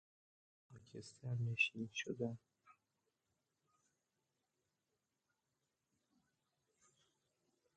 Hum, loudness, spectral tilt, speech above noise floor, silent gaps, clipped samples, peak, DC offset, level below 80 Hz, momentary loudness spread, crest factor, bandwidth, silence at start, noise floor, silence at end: none; -42 LUFS; -5 dB/octave; 46 dB; none; under 0.1%; -24 dBFS; under 0.1%; -84 dBFS; 19 LU; 26 dB; 8.8 kHz; 0.7 s; -89 dBFS; 5.05 s